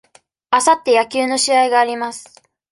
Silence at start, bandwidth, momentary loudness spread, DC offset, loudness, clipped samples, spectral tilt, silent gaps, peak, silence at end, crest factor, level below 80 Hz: 0.5 s; 11.5 kHz; 12 LU; under 0.1%; -15 LUFS; under 0.1%; -0.5 dB/octave; none; -2 dBFS; 0.5 s; 16 dB; -66 dBFS